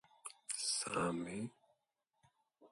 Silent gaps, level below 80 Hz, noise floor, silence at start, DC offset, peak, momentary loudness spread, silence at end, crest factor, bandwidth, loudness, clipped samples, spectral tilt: none; -76 dBFS; -86 dBFS; 0.25 s; under 0.1%; -24 dBFS; 14 LU; 0.05 s; 20 dB; 12 kHz; -40 LUFS; under 0.1%; -3 dB/octave